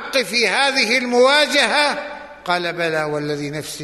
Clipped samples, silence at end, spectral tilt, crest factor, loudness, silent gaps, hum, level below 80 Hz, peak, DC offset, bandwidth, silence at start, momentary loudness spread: under 0.1%; 0 s; -2.5 dB/octave; 16 dB; -17 LUFS; none; none; -58 dBFS; -2 dBFS; under 0.1%; 12.5 kHz; 0 s; 12 LU